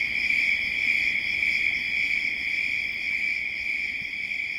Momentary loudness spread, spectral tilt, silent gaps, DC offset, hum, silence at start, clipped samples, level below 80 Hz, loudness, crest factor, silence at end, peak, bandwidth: 5 LU; -1 dB/octave; none; under 0.1%; none; 0 s; under 0.1%; -56 dBFS; -24 LUFS; 16 dB; 0 s; -12 dBFS; 16.5 kHz